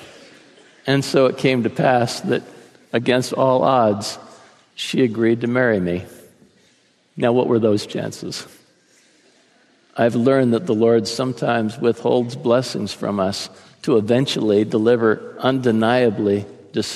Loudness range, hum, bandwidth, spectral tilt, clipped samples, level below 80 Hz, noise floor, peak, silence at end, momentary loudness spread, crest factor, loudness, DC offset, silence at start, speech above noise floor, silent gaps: 4 LU; none; 13.5 kHz; -6 dB/octave; under 0.1%; -64 dBFS; -58 dBFS; -2 dBFS; 0 s; 11 LU; 16 dB; -19 LUFS; under 0.1%; 0 s; 40 dB; none